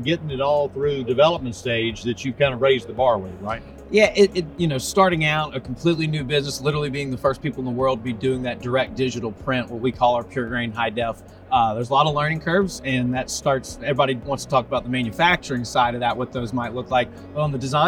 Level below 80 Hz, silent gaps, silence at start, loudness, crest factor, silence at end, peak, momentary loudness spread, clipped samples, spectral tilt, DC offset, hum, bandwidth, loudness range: -46 dBFS; none; 0 s; -22 LUFS; 18 dB; 0 s; -4 dBFS; 8 LU; under 0.1%; -5 dB/octave; under 0.1%; none; 17 kHz; 3 LU